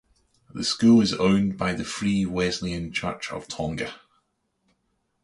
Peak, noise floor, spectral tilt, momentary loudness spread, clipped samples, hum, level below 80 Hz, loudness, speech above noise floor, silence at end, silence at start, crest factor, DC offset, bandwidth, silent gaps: -8 dBFS; -73 dBFS; -5 dB/octave; 15 LU; under 0.1%; none; -50 dBFS; -24 LUFS; 50 dB; 1.3 s; 0.55 s; 18 dB; under 0.1%; 11.5 kHz; none